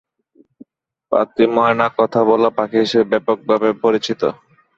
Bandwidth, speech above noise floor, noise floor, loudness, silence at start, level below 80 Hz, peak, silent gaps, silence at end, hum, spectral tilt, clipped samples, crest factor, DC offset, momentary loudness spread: 7.6 kHz; 39 dB; -55 dBFS; -16 LUFS; 1.1 s; -60 dBFS; -2 dBFS; none; 0.45 s; none; -6 dB/octave; under 0.1%; 16 dB; under 0.1%; 6 LU